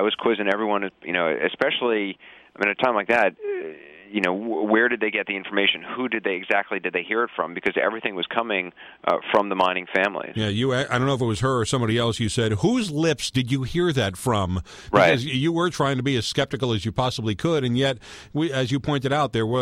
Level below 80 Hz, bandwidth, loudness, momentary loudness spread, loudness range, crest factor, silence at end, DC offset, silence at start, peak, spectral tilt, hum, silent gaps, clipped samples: -50 dBFS; 15 kHz; -23 LUFS; 6 LU; 2 LU; 18 dB; 0 s; under 0.1%; 0 s; -6 dBFS; -5 dB/octave; none; none; under 0.1%